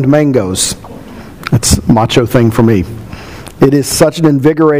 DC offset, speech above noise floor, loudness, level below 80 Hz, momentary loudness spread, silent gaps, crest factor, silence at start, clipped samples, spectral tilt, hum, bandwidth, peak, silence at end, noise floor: 1%; 20 dB; -10 LUFS; -30 dBFS; 19 LU; none; 10 dB; 0 s; 0.9%; -5.5 dB/octave; none; 16.5 kHz; 0 dBFS; 0 s; -29 dBFS